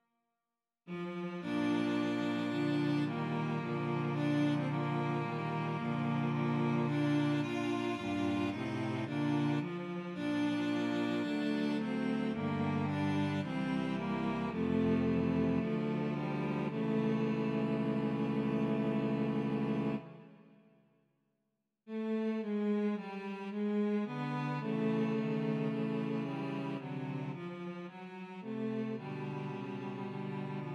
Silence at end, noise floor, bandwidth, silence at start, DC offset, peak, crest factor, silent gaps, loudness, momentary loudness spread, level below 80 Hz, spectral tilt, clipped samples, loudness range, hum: 0 s; under -90 dBFS; 10.5 kHz; 0.85 s; under 0.1%; -22 dBFS; 14 dB; none; -35 LUFS; 8 LU; -68 dBFS; -8 dB/octave; under 0.1%; 6 LU; none